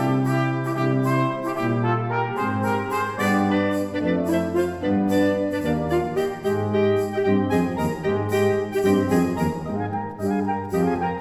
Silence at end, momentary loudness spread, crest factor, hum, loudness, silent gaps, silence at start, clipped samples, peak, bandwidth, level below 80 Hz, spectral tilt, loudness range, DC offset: 0 s; 4 LU; 14 dB; none; -23 LUFS; none; 0 s; under 0.1%; -8 dBFS; 19.5 kHz; -50 dBFS; -7 dB/octave; 1 LU; under 0.1%